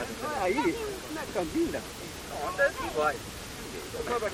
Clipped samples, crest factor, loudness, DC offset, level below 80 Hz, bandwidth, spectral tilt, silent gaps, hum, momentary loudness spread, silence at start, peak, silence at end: under 0.1%; 18 dB; -31 LUFS; under 0.1%; -50 dBFS; 17 kHz; -4 dB/octave; none; none; 11 LU; 0 s; -14 dBFS; 0 s